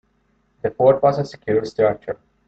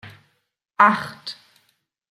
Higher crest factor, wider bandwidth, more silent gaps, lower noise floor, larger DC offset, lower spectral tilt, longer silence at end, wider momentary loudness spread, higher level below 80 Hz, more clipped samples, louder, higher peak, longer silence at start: second, 18 dB vs 24 dB; second, 7.8 kHz vs 14 kHz; neither; second, -64 dBFS vs -68 dBFS; neither; first, -7.5 dB/octave vs -5 dB/octave; second, 0.35 s vs 0.8 s; second, 13 LU vs 23 LU; first, -54 dBFS vs -72 dBFS; neither; about the same, -19 LUFS vs -18 LUFS; about the same, -2 dBFS vs 0 dBFS; first, 0.65 s vs 0.05 s